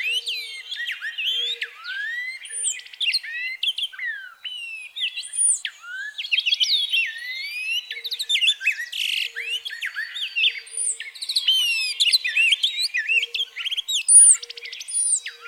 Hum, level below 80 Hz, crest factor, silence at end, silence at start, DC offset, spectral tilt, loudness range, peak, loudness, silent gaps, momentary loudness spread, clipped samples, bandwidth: none; -88 dBFS; 20 dB; 0 s; 0 s; under 0.1%; 8.5 dB/octave; 9 LU; -4 dBFS; -20 LUFS; none; 12 LU; under 0.1%; over 20 kHz